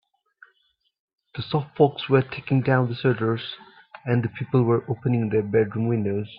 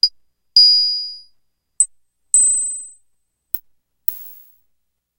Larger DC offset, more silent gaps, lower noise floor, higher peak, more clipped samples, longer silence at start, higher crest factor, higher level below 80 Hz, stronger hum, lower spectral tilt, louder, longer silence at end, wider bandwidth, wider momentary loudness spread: neither; neither; about the same, -70 dBFS vs -70 dBFS; about the same, -4 dBFS vs -2 dBFS; neither; first, 1.35 s vs 0.05 s; about the same, 20 dB vs 20 dB; about the same, -60 dBFS vs -62 dBFS; second, none vs 60 Hz at -85 dBFS; first, -12 dB/octave vs 5.5 dB/octave; second, -23 LUFS vs -14 LUFS; second, 0 s vs 0.85 s; second, 5.2 kHz vs 16 kHz; second, 10 LU vs 16 LU